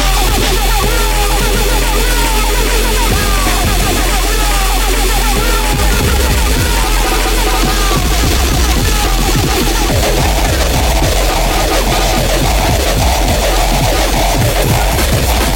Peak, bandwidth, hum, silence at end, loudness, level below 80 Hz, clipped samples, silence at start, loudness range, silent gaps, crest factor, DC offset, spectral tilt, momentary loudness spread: 0 dBFS; 17 kHz; none; 0 s; -12 LUFS; -14 dBFS; under 0.1%; 0 s; 0 LU; none; 10 dB; under 0.1%; -3.5 dB/octave; 1 LU